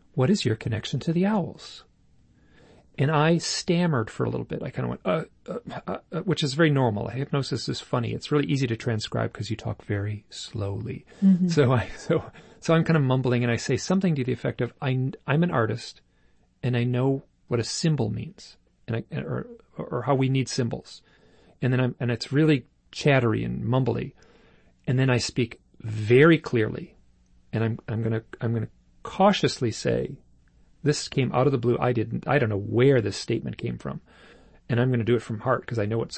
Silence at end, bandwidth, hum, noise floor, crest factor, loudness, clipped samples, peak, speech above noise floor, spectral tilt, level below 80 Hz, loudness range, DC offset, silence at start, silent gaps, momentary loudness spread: 0 s; 8.8 kHz; none; -61 dBFS; 20 dB; -25 LUFS; under 0.1%; -4 dBFS; 37 dB; -6.5 dB/octave; -56 dBFS; 4 LU; under 0.1%; 0.15 s; none; 14 LU